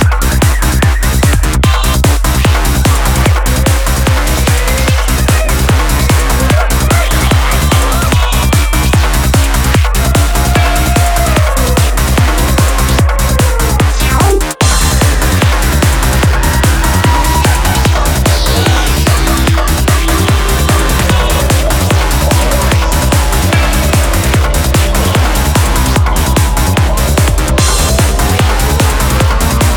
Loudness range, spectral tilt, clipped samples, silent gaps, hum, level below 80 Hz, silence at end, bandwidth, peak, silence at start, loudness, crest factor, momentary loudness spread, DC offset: 1 LU; -4.5 dB/octave; under 0.1%; none; none; -12 dBFS; 0 s; 19.5 kHz; 0 dBFS; 0 s; -10 LUFS; 8 dB; 1 LU; under 0.1%